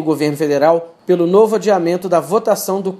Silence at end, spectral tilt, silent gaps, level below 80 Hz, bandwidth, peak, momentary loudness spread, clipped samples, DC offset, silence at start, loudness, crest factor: 0 s; -6 dB/octave; none; -68 dBFS; 15 kHz; 0 dBFS; 5 LU; under 0.1%; under 0.1%; 0 s; -15 LUFS; 14 dB